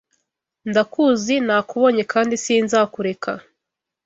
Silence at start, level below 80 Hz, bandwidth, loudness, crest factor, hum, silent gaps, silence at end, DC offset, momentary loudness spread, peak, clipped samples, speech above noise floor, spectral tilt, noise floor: 0.65 s; -64 dBFS; 8 kHz; -19 LUFS; 18 dB; none; none; 0.65 s; under 0.1%; 11 LU; -2 dBFS; under 0.1%; 64 dB; -4 dB/octave; -83 dBFS